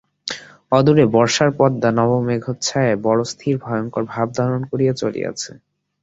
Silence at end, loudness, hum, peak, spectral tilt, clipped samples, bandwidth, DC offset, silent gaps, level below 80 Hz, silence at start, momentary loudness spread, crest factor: 0.5 s; -18 LUFS; none; -2 dBFS; -5.5 dB/octave; under 0.1%; 8 kHz; under 0.1%; none; -54 dBFS; 0.25 s; 13 LU; 16 dB